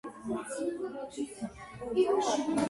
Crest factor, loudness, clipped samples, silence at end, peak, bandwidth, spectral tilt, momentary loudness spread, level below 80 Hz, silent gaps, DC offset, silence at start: 16 dB; -33 LUFS; under 0.1%; 0 s; -16 dBFS; 11.5 kHz; -4.5 dB/octave; 14 LU; -62 dBFS; none; under 0.1%; 0.05 s